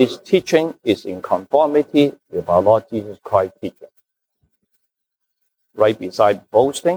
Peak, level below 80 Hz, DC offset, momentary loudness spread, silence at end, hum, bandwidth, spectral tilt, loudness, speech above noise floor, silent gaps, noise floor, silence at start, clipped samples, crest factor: -2 dBFS; -58 dBFS; under 0.1%; 12 LU; 0 s; none; over 20 kHz; -5.5 dB/octave; -18 LUFS; 61 dB; none; -78 dBFS; 0 s; under 0.1%; 18 dB